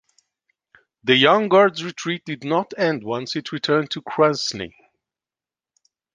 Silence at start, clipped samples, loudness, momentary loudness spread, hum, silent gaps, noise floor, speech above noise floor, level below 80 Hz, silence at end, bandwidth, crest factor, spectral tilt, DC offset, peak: 1.05 s; under 0.1%; -20 LUFS; 13 LU; none; none; under -90 dBFS; over 70 dB; -64 dBFS; 1.45 s; 9.8 kHz; 20 dB; -4.5 dB/octave; under 0.1%; -2 dBFS